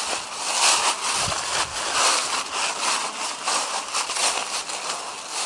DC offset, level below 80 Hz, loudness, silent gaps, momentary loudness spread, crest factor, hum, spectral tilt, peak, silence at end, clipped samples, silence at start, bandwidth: under 0.1%; -58 dBFS; -22 LUFS; none; 9 LU; 18 dB; none; 1 dB/octave; -6 dBFS; 0 s; under 0.1%; 0 s; 11.5 kHz